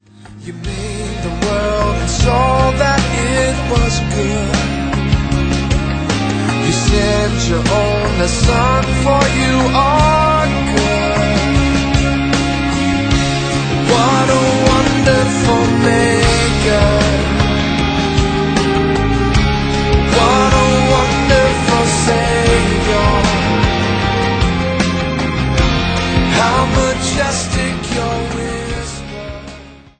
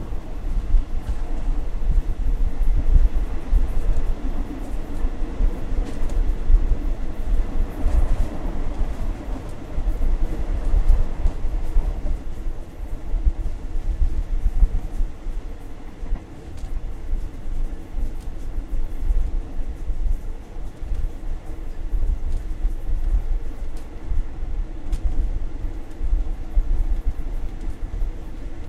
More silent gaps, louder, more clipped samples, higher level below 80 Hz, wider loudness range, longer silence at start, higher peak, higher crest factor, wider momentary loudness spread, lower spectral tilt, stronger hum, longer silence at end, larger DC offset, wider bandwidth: neither; first, -14 LUFS vs -29 LUFS; neither; about the same, -22 dBFS vs -22 dBFS; second, 3 LU vs 6 LU; first, 0.2 s vs 0 s; about the same, 0 dBFS vs -2 dBFS; about the same, 14 dB vs 18 dB; second, 6 LU vs 11 LU; second, -5 dB/octave vs -7.5 dB/octave; neither; first, 0.25 s vs 0 s; neither; first, 9.2 kHz vs 3.8 kHz